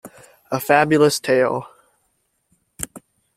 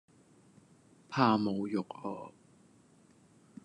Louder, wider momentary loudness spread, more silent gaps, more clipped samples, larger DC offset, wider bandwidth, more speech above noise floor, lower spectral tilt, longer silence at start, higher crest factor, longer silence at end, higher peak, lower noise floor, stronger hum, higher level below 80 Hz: first, -18 LUFS vs -33 LUFS; about the same, 16 LU vs 17 LU; neither; neither; neither; first, 16.5 kHz vs 10.5 kHz; first, 52 dB vs 32 dB; second, -4.5 dB/octave vs -7 dB/octave; second, 0.05 s vs 1.1 s; second, 20 dB vs 26 dB; second, 0.4 s vs 1.35 s; first, -2 dBFS vs -12 dBFS; first, -69 dBFS vs -63 dBFS; neither; first, -56 dBFS vs -82 dBFS